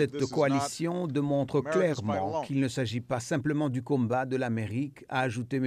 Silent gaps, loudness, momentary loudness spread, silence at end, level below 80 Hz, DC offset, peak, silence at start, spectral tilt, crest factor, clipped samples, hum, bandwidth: none; -30 LUFS; 5 LU; 0 s; -66 dBFS; under 0.1%; -14 dBFS; 0 s; -6.5 dB/octave; 14 dB; under 0.1%; none; 14.5 kHz